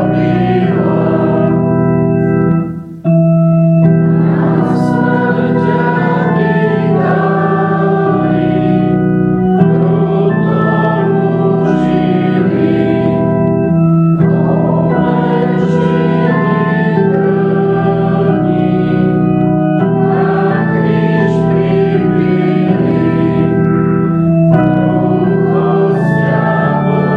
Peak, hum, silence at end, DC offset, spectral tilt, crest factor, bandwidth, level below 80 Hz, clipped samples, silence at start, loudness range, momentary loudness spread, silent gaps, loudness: 0 dBFS; none; 0 s; under 0.1%; -10 dB/octave; 10 dB; 4.9 kHz; -40 dBFS; under 0.1%; 0 s; 1 LU; 2 LU; none; -11 LUFS